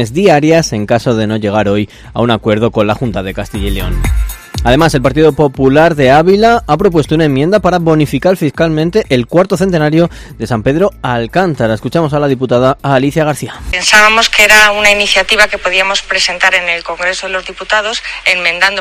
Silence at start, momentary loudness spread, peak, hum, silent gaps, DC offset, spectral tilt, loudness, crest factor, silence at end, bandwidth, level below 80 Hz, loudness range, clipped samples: 0 s; 10 LU; 0 dBFS; none; none; under 0.1%; -4.5 dB/octave; -10 LUFS; 10 dB; 0 s; 19.5 kHz; -26 dBFS; 6 LU; 1%